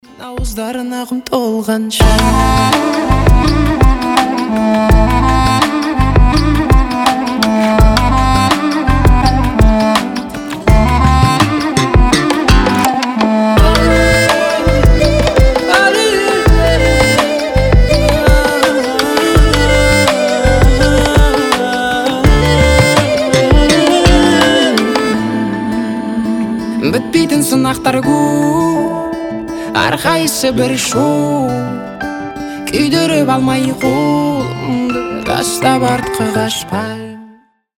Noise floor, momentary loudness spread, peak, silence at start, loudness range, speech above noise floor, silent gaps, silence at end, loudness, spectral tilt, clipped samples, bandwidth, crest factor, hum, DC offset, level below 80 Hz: -44 dBFS; 8 LU; 0 dBFS; 0.2 s; 4 LU; 32 dB; none; 0.5 s; -12 LUFS; -5 dB/octave; under 0.1%; 18.5 kHz; 10 dB; none; under 0.1%; -16 dBFS